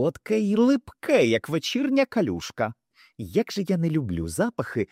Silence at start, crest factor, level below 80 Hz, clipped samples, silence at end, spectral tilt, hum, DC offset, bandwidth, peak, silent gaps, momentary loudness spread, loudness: 0 s; 16 dB; -56 dBFS; under 0.1%; 0.05 s; -6 dB/octave; none; under 0.1%; 16 kHz; -8 dBFS; none; 8 LU; -24 LUFS